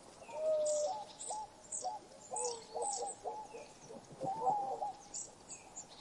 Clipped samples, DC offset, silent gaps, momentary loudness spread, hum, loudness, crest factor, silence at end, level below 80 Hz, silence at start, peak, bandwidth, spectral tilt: under 0.1%; under 0.1%; none; 15 LU; none; -40 LUFS; 18 dB; 0 s; -74 dBFS; 0 s; -22 dBFS; 11.5 kHz; -2 dB/octave